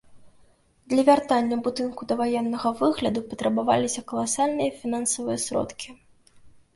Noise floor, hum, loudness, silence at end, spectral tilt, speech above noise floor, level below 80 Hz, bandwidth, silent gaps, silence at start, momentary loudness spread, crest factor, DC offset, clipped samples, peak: -58 dBFS; none; -25 LUFS; 0.25 s; -4 dB/octave; 34 dB; -60 dBFS; 11.5 kHz; none; 0.1 s; 8 LU; 20 dB; under 0.1%; under 0.1%; -6 dBFS